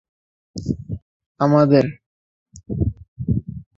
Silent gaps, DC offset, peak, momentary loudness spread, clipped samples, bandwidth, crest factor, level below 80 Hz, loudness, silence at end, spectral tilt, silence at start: 1.02-1.20 s, 1.26-1.35 s, 2.06-2.46 s, 3.08-3.16 s; under 0.1%; -2 dBFS; 18 LU; under 0.1%; 7.8 kHz; 20 dB; -38 dBFS; -20 LUFS; 0.15 s; -8.5 dB/octave; 0.55 s